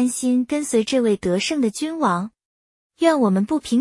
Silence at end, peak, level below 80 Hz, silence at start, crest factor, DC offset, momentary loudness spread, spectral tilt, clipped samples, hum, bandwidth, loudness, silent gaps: 0 s; -4 dBFS; -58 dBFS; 0 s; 16 dB; under 0.1%; 4 LU; -5 dB/octave; under 0.1%; none; 12 kHz; -20 LUFS; 2.45-2.90 s